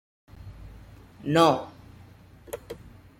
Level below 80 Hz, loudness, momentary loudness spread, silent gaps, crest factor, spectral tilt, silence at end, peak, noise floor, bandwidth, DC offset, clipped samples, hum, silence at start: -54 dBFS; -23 LUFS; 27 LU; none; 24 dB; -5.5 dB/octave; 0.45 s; -6 dBFS; -51 dBFS; 16.5 kHz; under 0.1%; under 0.1%; none; 0.4 s